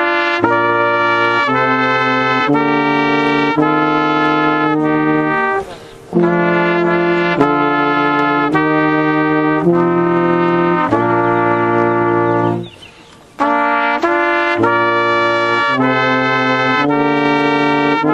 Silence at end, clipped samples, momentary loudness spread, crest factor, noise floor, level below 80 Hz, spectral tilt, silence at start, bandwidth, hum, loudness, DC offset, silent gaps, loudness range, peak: 0 s; under 0.1%; 1 LU; 14 dB; -41 dBFS; -50 dBFS; -7 dB/octave; 0 s; 8.2 kHz; none; -13 LUFS; under 0.1%; none; 2 LU; 0 dBFS